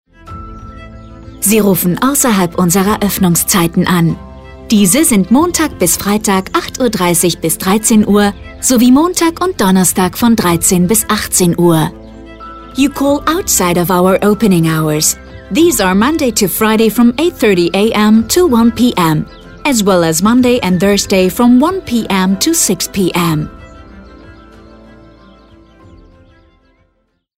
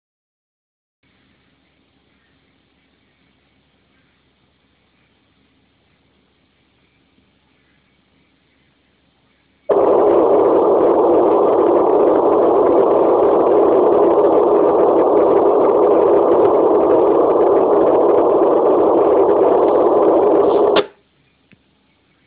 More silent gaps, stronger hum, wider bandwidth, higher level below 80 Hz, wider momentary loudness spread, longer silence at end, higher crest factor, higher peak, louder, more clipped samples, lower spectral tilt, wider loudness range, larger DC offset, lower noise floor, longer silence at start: neither; neither; first, 16.5 kHz vs 4 kHz; first, -36 dBFS vs -52 dBFS; first, 7 LU vs 1 LU; first, 3.05 s vs 1.4 s; about the same, 12 dB vs 14 dB; about the same, 0 dBFS vs -2 dBFS; about the same, -11 LUFS vs -13 LUFS; neither; second, -4.5 dB/octave vs -10 dB/octave; about the same, 3 LU vs 4 LU; neither; about the same, -61 dBFS vs -59 dBFS; second, 0.25 s vs 9.7 s